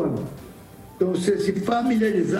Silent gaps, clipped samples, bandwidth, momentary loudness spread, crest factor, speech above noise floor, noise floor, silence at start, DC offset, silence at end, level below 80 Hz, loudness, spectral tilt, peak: none; under 0.1%; 16 kHz; 17 LU; 14 dB; 21 dB; -43 dBFS; 0 s; under 0.1%; 0 s; -54 dBFS; -23 LUFS; -6.5 dB/octave; -8 dBFS